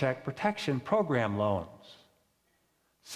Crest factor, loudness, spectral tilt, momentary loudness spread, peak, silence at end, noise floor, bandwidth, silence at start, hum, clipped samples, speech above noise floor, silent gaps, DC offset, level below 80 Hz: 20 dB; -31 LUFS; -6.5 dB/octave; 6 LU; -14 dBFS; 0 s; -73 dBFS; 15 kHz; 0 s; none; under 0.1%; 42 dB; none; under 0.1%; -60 dBFS